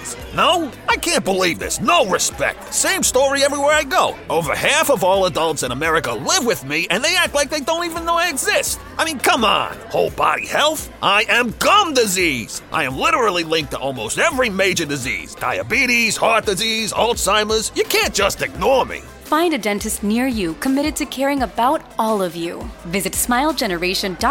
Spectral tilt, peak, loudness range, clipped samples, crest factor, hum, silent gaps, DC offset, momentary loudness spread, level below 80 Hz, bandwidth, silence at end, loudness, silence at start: -2.5 dB/octave; -2 dBFS; 3 LU; under 0.1%; 16 dB; none; none; under 0.1%; 7 LU; -40 dBFS; 17 kHz; 0 s; -17 LUFS; 0 s